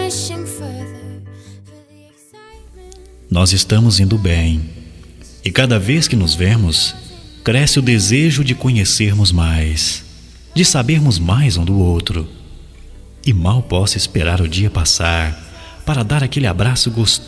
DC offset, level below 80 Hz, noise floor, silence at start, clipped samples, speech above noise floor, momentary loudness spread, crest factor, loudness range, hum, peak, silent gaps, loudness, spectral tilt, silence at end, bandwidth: under 0.1%; -28 dBFS; -46 dBFS; 0 s; under 0.1%; 32 dB; 14 LU; 16 dB; 3 LU; none; 0 dBFS; none; -14 LUFS; -4.5 dB/octave; 0 s; 11 kHz